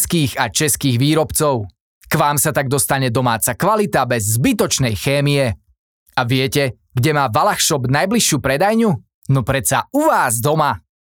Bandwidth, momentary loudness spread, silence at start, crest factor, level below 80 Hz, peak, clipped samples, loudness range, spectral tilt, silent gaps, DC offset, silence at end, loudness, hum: over 20 kHz; 5 LU; 0 s; 16 dB; -44 dBFS; 0 dBFS; under 0.1%; 2 LU; -4 dB/octave; 1.81-2.01 s, 5.79-6.06 s, 9.14-9.22 s; under 0.1%; 0.25 s; -16 LUFS; none